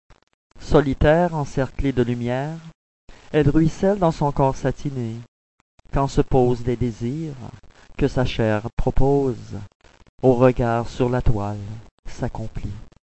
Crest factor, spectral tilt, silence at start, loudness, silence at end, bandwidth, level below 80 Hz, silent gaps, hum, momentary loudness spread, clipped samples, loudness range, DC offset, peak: 20 dB; -7.5 dB/octave; 0.55 s; -21 LUFS; 0.3 s; 8.4 kHz; -32 dBFS; 2.75-3.08 s, 5.28-5.78 s, 8.73-8.77 s, 9.75-9.80 s, 10.09-10.18 s, 11.91-12.03 s; none; 18 LU; under 0.1%; 3 LU; under 0.1%; -2 dBFS